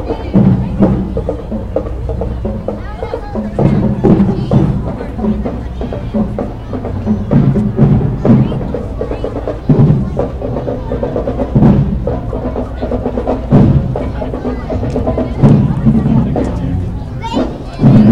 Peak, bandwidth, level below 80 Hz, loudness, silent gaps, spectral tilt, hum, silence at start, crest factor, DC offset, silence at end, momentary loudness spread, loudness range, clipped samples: 0 dBFS; 7.4 kHz; -22 dBFS; -14 LUFS; none; -10 dB/octave; none; 0 s; 12 dB; 1%; 0 s; 11 LU; 3 LU; 0.3%